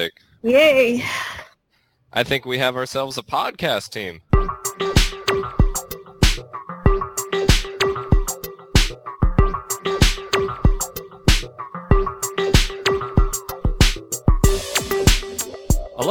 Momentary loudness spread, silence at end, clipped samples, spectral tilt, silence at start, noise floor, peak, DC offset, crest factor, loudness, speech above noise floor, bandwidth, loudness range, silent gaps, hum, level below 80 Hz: 9 LU; 0 s; under 0.1%; -4 dB/octave; 0 s; -65 dBFS; 0 dBFS; under 0.1%; 20 dB; -20 LUFS; 45 dB; 18 kHz; 2 LU; none; none; -24 dBFS